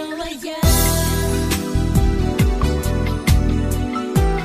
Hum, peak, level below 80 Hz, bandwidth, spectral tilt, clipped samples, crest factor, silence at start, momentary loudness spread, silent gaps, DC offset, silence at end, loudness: none; -4 dBFS; -22 dBFS; 14.5 kHz; -5 dB/octave; under 0.1%; 14 dB; 0 s; 6 LU; none; under 0.1%; 0 s; -19 LUFS